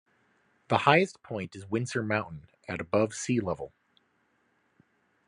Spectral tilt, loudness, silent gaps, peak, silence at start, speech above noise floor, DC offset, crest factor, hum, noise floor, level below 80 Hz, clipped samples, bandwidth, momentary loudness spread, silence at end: -5 dB/octave; -29 LUFS; none; -6 dBFS; 0.7 s; 43 dB; under 0.1%; 26 dB; none; -71 dBFS; -68 dBFS; under 0.1%; 11.5 kHz; 16 LU; 1.6 s